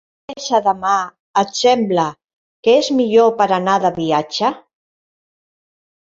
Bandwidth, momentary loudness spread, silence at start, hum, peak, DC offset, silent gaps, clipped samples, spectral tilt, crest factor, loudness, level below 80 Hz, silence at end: 7.8 kHz; 7 LU; 0.3 s; none; -2 dBFS; under 0.1%; 1.19-1.34 s, 2.24-2.63 s; under 0.1%; -4.5 dB/octave; 16 dB; -16 LUFS; -60 dBFS; 1.45 s